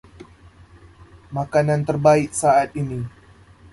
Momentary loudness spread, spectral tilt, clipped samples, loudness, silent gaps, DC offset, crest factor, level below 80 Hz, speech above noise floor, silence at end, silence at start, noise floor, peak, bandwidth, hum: 15 LU; -6 dB/octave; under 0.1%; -20 LUFS; none; under 0.1%; 20 dB; -50 dBFS; 29 dB; 0.65 s; 0.2 s; -48 dBFS; -2 dBFS; 11.5 kHz; none